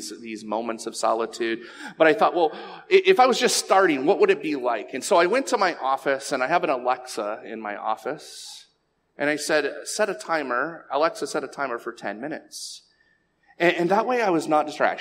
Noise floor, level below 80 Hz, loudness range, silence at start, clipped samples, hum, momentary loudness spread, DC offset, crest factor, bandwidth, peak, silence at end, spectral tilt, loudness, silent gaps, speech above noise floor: -69 dBFS; -78 dBFS; 8 LU; 0 s; under 0.1%; none; 15 LU; under 0.1%; 20 dB; 16 kHz; -4 dBFS; 0 s; -3 dB/octave; -23 LUFS; none; 45 dB